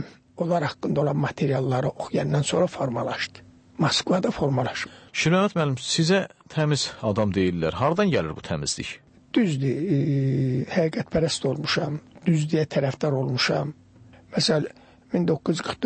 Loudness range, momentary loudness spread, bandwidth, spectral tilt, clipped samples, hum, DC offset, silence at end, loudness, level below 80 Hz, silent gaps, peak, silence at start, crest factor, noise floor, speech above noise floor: 2 LU; 8 LU; 8.8 kHz; -5.5 dB/octave; under 0.1%; none; under 0.1%; 0 s; -24 LUFS; -54 dBFS; none; -10 dBFS; 0 s; 14 dB; -50 dBFS; 27 dB